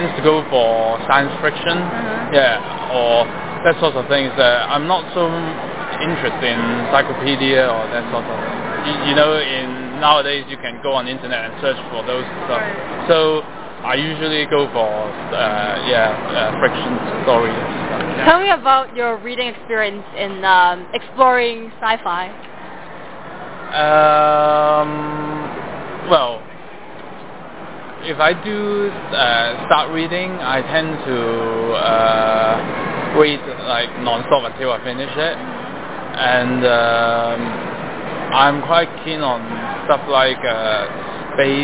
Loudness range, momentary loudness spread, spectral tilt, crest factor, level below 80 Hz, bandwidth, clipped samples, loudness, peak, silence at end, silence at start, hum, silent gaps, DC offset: 3 LU; 13 LU; -8.5 dB/octave; 18 dB; -50 dBFS; 4 kHz; under 0.1%; -17 LUFS; 0 dBFS; 0 s; 0 s; none; none; 2%